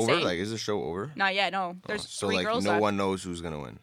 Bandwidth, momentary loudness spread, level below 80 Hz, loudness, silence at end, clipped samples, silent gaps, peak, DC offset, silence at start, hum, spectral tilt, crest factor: 15.5 kHz; 9 LU; -62 dBFS; -29 LUFS; 0.05 s; under 0.1%; none; -10 dBFS; under 0.1%; 0 s; none; -4 dB/octave; 18 dB